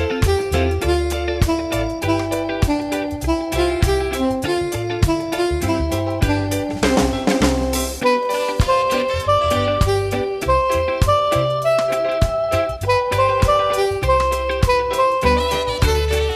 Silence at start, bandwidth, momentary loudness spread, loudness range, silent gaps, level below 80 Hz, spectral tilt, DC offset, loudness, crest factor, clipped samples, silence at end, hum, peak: 0 s; 14 kHz; 4 LU; 3 LU; none; -28 dBFS; -5.5 dB/octave; under 0.1%; -19 LUFS; 16 dB; under 0.1%; 0 s; none; -2 dBFS